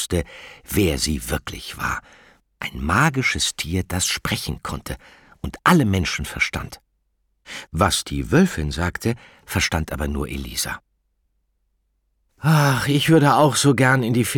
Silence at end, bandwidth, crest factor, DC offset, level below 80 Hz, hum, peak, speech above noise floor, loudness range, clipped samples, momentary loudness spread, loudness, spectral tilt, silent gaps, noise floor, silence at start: 0 s; 19 kHz; 20 dB; under 0.1%; -38 dBFS; none; -2 dBFS; 49 dB; 5 LU; under 0.1%; 16 LU; -20 LUFS; -4.5 dB/octave; none; -69 dBFS; 0 s